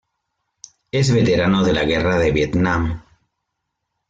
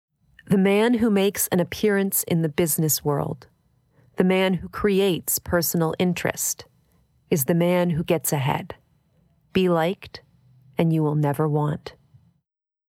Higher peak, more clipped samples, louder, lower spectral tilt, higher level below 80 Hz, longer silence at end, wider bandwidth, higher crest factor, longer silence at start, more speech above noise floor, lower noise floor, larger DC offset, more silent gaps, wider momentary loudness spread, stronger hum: about the same, -6 dBFS vs -6 dBFS; neither; first, -18 LUFS vs -22 LUFS; about the same, -6 dB/octave vs -5 dB/octave; first, -38 dBFS vs -54 dBFS; about the same, 1.1 s vs 1 s; second, 9.2 kHz vs 17 kHz; about the same, 14 dB vs 18 dB; first, 0.95 s vs 0.5 s; about the same, 60 dB vs 57 dB; about the same, -77 dBFS vs -79 dBFS; neither; neither; about the same, 8 LU vs 10 LU; neither